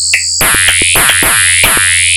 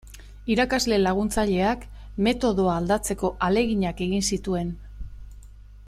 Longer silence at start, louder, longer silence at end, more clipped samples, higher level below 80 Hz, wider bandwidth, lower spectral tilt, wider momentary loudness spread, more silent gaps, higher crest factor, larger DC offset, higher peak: about the same, 0 s vs 0.05 s; first, -6 LUFS vs -24 LUFS; about the same, 0 s vs 0 s; first, 0.3% vs under 0.1%; first, -30 dBFS vs -40 dBFS; first, over 20 kHz vs 15 kHz; second, 0 dB/octave vs -5 dB/octave; second, 2 LU vs 15 LU; neither; second, 8 dB vs 16 dB; neither; first, 0 dBFS vs -8 dBFS